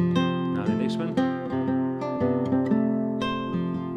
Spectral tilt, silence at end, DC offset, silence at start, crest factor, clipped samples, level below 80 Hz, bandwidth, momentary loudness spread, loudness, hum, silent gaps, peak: -8 dB/octave; 0 s; under 0.1%; 0 s; 14 dB; under 0.1%; -60 dBFS; 8.8 kHz; 4 LU; -26 LUFS; none; none; -10 dBFS